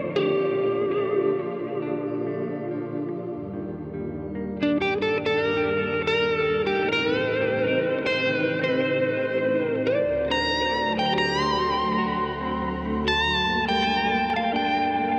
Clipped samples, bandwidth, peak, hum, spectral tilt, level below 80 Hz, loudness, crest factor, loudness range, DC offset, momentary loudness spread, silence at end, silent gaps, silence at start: under 0.1%; 8.6 kHz; -12 dBFS; none; -6 dB/octave; -46 dBFS; -24 LUFS; 12 dB; 5 LU; under 0.1%; 8 LU; 0 s; none; 0 s